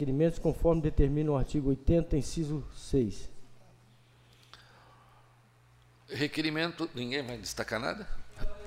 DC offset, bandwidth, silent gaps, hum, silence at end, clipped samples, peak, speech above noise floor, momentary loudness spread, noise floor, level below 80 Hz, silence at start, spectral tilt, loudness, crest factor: under 0.1%; 16 kHz; none; none; 0 s; under 0.1%; -12 dBFS; 32 dB; 12 LU; -61 dBFS; -40 dBFS; 0 s; -6 dB/octave; -32 LUFS; 18 dB